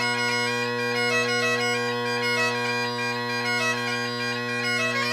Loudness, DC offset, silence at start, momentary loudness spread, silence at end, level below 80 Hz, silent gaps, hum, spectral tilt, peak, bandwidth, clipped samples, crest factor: -24 LUFS; under 0.1%; 0 s; 4 LU; 0 s; -74 dBFS; none; none; -3 dB/octave; -10 dBFS; 15.5 kHz; under 0.1%; 14 dB